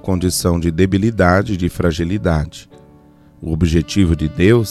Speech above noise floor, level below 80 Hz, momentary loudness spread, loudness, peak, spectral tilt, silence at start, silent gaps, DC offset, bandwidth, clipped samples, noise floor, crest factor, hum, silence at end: 30 dB; -30 dBFS; 8 LU; -16 LUFS; 0 dBFS; -6 dB/octave; 0.05 s; none; under 0.1%; 14 kHz; under 0.1%; -46 dBFS; 16 dB; none; 0 s